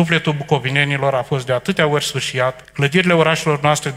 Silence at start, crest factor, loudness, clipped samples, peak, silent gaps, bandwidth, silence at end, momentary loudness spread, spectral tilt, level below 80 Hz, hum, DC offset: 0 s; 16 dB; -17 LUFS; under 0.1%; 0 dBFS; none; 15.5 kHz; 0 s; 6 LU; -5 dB/octave; -52 dBFS; none; under 0.1%